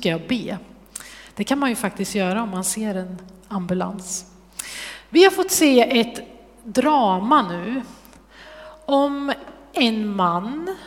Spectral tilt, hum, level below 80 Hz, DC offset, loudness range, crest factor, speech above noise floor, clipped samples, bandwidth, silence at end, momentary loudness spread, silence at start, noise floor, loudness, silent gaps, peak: -4 dB/octave; none; -54 dBFS; under 0.1%; 7 LU; 22 dB; 26 dB; under 0.1%; 16.5 kHz; 0 s; 21 LU; 0 s; -46 dBFS; -21 LUFS; none; 0 dBFS